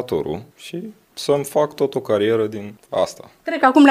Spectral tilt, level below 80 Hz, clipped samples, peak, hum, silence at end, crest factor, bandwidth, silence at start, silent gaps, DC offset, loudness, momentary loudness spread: -5.5 dB/octave; -58 dBFS; under 0.1%; 0 dBFS; none; 0 s; 18 dB; 15.5 kHz; 0 s; none; under 0.1%; -20 LUFS; 15 LU